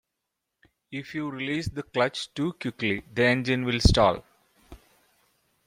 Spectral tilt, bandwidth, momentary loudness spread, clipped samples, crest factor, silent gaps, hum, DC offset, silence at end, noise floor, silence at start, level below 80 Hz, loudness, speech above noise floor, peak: -5.5 dB/octave; 16 kHz; 13 LU; under 0.1%; 24 dB; none; none; under 0.1%; 0.9 s; -83 dBFS; 0.9 s; -40 dBFS; -26 LUFS; 57 dB; -4 dBFS